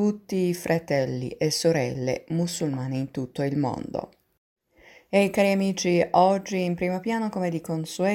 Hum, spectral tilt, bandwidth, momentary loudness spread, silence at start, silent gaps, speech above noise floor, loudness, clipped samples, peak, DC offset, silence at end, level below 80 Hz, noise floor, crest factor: none; -5.5 dB/octave; 16.5 kHz; 9 LU; 0 s; 4.38-4.56 s; 30 dB; -25 LUFS; under 0.1%; -6 dBFS; under 0.1%; 0 s; -60 dBFS; -55 dBFS; 20 dB